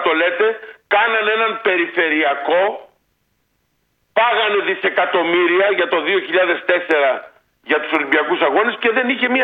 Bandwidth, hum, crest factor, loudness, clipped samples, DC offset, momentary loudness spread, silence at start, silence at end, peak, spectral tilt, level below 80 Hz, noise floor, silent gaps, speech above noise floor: 5 kHz; none; 18 dB; -16 LUFS; under 0.1%; under 0.1%; 4 LU; 0 s; 0 s; 0 dBFS; -5.5 dB/octave; -70 dBFS; -66 dBFS; none; 50 dB